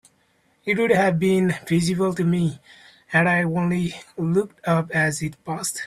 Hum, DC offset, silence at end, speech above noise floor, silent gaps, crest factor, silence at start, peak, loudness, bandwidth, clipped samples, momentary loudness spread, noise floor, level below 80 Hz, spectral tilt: none; under 0.1%; 0 s; 42 dB; none; 16 dB; 0.65 s; -6 dBFS; -22 LUFS; 13.5 kHz; under 0.1%; 10 LU; -63 dBFS; -56 dBFS; -6 dB/octave